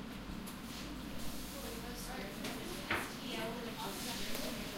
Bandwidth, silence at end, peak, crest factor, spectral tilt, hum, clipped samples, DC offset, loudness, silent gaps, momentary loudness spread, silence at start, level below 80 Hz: 16 kHz; 0 s; -22 dBFS; 20 dB; -3.5 dB/octave; none; under 0.1%; under 0.1%; -42 LUFS; none; 7 LU; 0 s; -54 dBFS